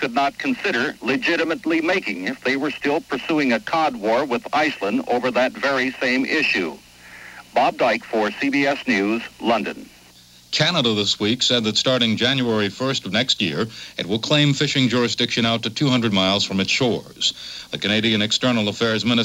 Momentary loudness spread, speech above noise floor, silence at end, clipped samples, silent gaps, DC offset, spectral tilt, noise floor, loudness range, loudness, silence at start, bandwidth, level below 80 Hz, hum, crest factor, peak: 6 LU; 28 dB; 0 s; under 0.1%; none; under 0.1%; -4 dB/octave; -48 dBFS; 3 LU; -20 LUFS; 0 s; 16.5 kHz; -58 dBFS; none; 18 dB; -2 dBFS